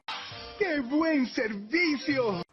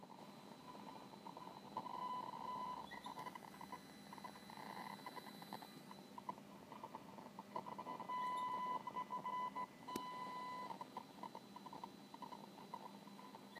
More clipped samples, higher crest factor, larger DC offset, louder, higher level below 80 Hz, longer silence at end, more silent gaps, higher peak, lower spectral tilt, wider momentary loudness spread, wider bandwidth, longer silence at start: neither; second, 14 dB vs 22 dB; neither; first, -28 LUFS vs -51 LUFS; first, -62 dBFS vs -88 dBFS; about the same, 0.1 s vs 0 s; neither; first, -14 dBFS vs -28 dBFS; about the same, -5.5 dB/octave vs -4.5 dB/octave; about the same, 11 LU vs 11 LU; second, 6.6 kHz vs 15.5 kHz; about the same, 0.1 s vs 0 s